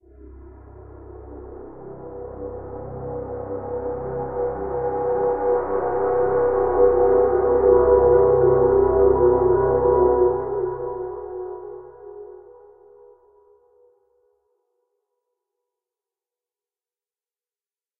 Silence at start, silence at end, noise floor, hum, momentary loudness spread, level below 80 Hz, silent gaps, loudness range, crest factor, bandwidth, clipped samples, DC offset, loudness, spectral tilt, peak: 0.2 s; 5.6 s; under -90 dBFS; none; 23 LU; -42 dBFS; none; 19 LU; 18 dB; 2.4 kHz; under 0.1%; under 0.1%; -19 LUFS; -14.5 dB/octave; -4 dBFS